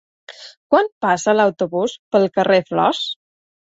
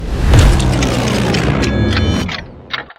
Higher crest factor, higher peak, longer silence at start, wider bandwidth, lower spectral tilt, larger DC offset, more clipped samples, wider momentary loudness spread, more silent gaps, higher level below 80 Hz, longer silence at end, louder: about the same, 18 dB vs 14 dB; about the same, -2 dBFS vs 0 dBFS; first, 0.3 s vs 0 s; second, 8 kHz vs 15 kHz; about the same, -4.5 dB/octave vs -5.5 dB/octave; neither; second, under 0.1% vs 0.1%; first, 18 LU vs 13 LU; first, 0.57-0.70 s, 0.92-1.01 s, 1.99-2.11 s vs none; second, -64 dBFS vs -18 dBFS; first, 0.55 s vs 0.15 s; second, -18 LUFS vs -14 LUFS